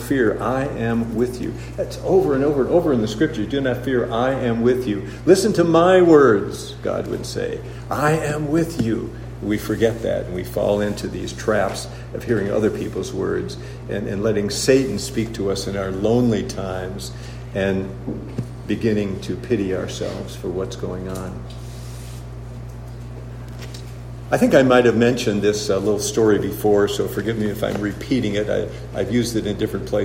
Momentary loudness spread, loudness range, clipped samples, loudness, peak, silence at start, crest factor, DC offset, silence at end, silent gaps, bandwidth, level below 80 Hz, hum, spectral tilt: 16 LU; 8 LU; under 0.1%; -20 LUFS; -2 dBFS; 0 s; 20 dB; under 0.1%; 0 s; none; 16 kHz; -40 dBFS; none; -6 dB/octave